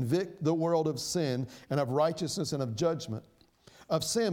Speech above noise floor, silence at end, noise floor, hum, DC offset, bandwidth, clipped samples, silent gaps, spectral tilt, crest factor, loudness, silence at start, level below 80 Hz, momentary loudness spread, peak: 28 dB; 0 s; -59 dBFS; none; under 0.1%; 17.5 kHz; under 0.1%; none; -5.5 dB/octave; 16 dB; -31 LUFS; 0 s; -66 dBFS; 7 LU; -14 dBFS